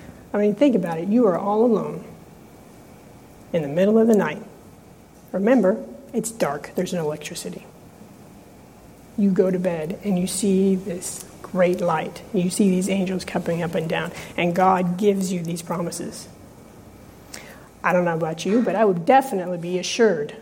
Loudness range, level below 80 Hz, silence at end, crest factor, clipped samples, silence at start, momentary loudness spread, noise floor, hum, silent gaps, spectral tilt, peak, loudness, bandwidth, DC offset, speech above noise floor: 5 LU; -56 dBFS; 0 s; 18 dB; under 0.1%; 0 s; 14 LU; -47 dBFS; none; none; -6 dB/octave; -4 dBFS; -22 LUFS; 16.5 kHz; under 0.1%; 26 dB